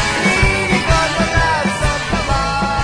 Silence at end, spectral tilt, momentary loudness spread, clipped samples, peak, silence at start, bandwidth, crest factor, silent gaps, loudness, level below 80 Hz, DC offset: 0 s; -4 dB/octave; 4 LU; under 0.1%; -2 dBFS; 0 s; 13.5 kHz; 14 dB; none; -15 LUFS; -24 dBFS; under 0.1%